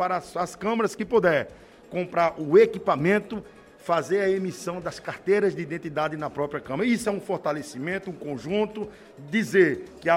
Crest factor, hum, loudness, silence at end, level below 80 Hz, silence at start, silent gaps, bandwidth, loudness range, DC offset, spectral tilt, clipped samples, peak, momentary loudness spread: 20 dB; none; -25 LUFS; 0 s; -60 dBFS; 0 s; none; 16 kHz; 5 LU; under 0.1%; -6 dB/octave; under 0.1%; -6 dBFS; 13 LU